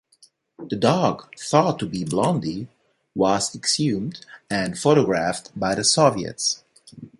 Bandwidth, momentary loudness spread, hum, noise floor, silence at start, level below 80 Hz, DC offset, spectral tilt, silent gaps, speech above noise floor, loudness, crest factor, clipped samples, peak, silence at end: 11.5 kHz; 14 LU; none; -58 dBFS; 0.6 s; -56 dBFS; under 0.1%; -4 dB/octave; none; 36 dB; -22 LUFS; 20 dB; under 0.1%; -2 dBFS; 0.1 s